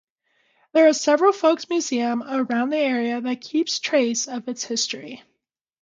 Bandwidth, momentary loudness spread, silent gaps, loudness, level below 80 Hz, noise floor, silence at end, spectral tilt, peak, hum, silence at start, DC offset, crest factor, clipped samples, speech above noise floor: 9.4 kHz; 10 LU; none; -21 LUFS; -76 dBFS; -77 dBFS; 0.65 s; -2.5 dB/octave; -6 dBFS; none; 0.75 s; under 0.1%; 18 dB; under 0.1%; 56 dB